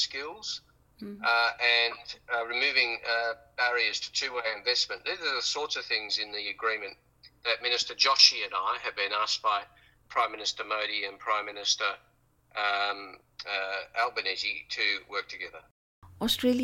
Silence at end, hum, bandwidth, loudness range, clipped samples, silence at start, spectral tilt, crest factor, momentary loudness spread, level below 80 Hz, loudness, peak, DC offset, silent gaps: 0 s; none; 16.5 kHz; 5 LU; under 0.1%; 0 s; -0.5 dB/octave; 26 dB; 12 LU; -66 dBFS; -28 LUFS; -4 dBFS; under 0.1%; 15.71-16.02 s